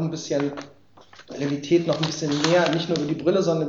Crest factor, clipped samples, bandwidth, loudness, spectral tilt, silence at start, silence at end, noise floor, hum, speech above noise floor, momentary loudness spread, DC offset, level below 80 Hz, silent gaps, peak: 18 dB; under 0.1%; 7.8 kHz; -23 LUFS; -5.5 dB/octave; 0 s; 0 s; -50 dBFS; none; 28 dB; 10 LU; under 0.1%; -62 dBFS; none; -6 dBFS